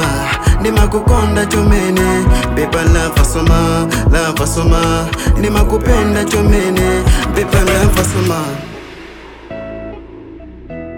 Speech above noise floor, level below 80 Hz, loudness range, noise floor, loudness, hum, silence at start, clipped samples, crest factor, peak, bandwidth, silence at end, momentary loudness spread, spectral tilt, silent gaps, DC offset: 21 dB; -16 dBFS; 4 LU; -33 dBFS; -13 LUFS; none; 0 s; under 0.1%; 12 dB; 0 dBFS; 18 kHz; 0 s; 18 LU; -5.5 dB/octave; none; under 0.1%